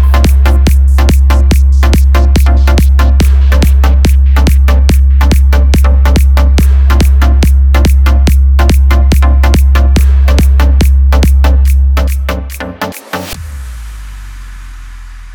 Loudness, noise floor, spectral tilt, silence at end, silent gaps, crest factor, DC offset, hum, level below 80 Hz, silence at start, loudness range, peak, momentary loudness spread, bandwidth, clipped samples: -8 LUFS; -26 dBFS; -6.5 dB/octave; 0 s; none; 6 dB; under 0.1%; none; -6 dBFS; 0 s; 5 LU; 0 dBFS; 12 LU; 16 kHz; 0.2%